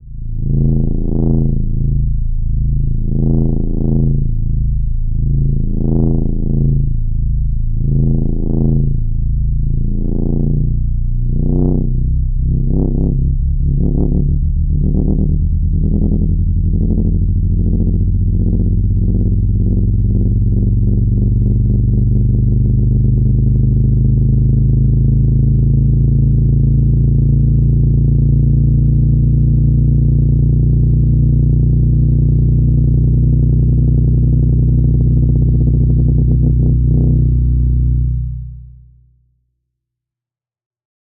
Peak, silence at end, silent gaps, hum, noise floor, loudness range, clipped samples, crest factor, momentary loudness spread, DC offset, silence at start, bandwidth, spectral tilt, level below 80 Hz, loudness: -2 dBFS; 2.4 s; none; none; -89 dBFS; 5 LU; under 0.1%; 10 dB; 6 LU; 0.3%; 0 s; 1 kHz; -18 dB/octave; -16 dBFS; -14 LUFS